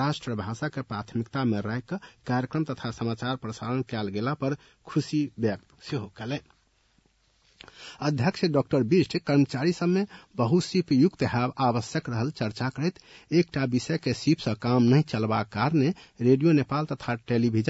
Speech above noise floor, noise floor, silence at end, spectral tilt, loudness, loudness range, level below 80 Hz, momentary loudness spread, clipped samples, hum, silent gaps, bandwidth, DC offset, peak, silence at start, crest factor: 40 dB; -66 dBFS; 0 s; -7 dB/octave; -27 LUFS; 7 LU; -62 dBFS; 11 LU; under 0.1%; none; none; 8 kHz; under 0.1%; -10 dBFS; 0 s; 16 dB